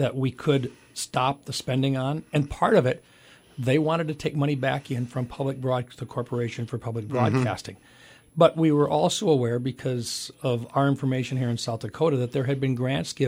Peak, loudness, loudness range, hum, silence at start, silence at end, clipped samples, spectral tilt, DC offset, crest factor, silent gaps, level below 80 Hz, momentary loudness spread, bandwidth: -6 dBFS; -26 LUFS; 4 LU; none; 0 s; 0 s; under 0.1%; -6 dB/octave; under 0.1%; 20 dB; none; -56 dBFS; 10 LU; 15.5 kHz